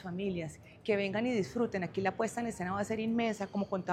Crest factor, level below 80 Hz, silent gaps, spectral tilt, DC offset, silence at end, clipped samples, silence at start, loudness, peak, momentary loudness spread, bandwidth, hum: 18 dB; -64 dBFS; none; -6 dB/octave; under 0.1%; 0 s; under 0.1%; 0 s; -34 LUFS; -16 dBFS; 5 LU; 14 kHz; none